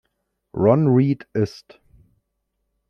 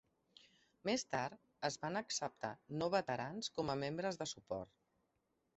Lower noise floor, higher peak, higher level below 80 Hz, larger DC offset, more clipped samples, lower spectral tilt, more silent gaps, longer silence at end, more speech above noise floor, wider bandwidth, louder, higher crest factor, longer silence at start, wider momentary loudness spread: second, -75 dBFS vs -83 dBFS; first, -2 dBFS vs -22 dBFS; first, -58 dBFS vs -74 dBFS; neither; neither; first, -9.5 dB/octave vs -3.5 dB/octave; neither; first, 1.4 s vs 0.9 s; first, 56 dB vs 42 dB; second, 6.6 kHz vs 8 kHz; first, -19 LUFS vs -42 LUFS; about the same, 20 dB vs 22 dB; second, 0.55 s vs 0.85 s; about the same, 10 LU vs 9 LU